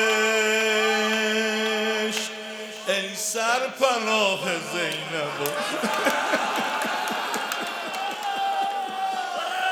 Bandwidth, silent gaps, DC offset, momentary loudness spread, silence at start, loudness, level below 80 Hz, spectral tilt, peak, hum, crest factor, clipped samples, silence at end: over 20 kHz; none; under 0.1%; 8 LU; 0 s; -24 LUFS; -80 dBFS; -2 dB/octave; -6 dBFS; none; 20 dB; under 0.1%; 0 s